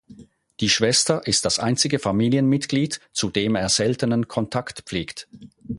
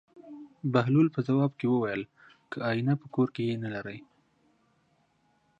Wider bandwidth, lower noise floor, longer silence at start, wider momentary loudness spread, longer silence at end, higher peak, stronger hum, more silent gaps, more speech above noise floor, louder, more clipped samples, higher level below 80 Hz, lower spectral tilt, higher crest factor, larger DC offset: first, 11.5 kHz vs 7.4 kHz; second, -47 dBFS vs -70 dBFS; about the same, 0.1 s vs 0.15 s; second, 11 LU vs 20 LU; second, 0 s vs 1.6 s; first, -4 dBFS vs -10 dBFS; neither; neither; second, 26 dB vs 42 dB; first, -21 LUFS vs -29 LUFS; neither; first, -52 dBFS vs -70 dBFS; second, -4 dB/octave vs -9 dB/octave; about the same, 18 dB vs 22 dB; neither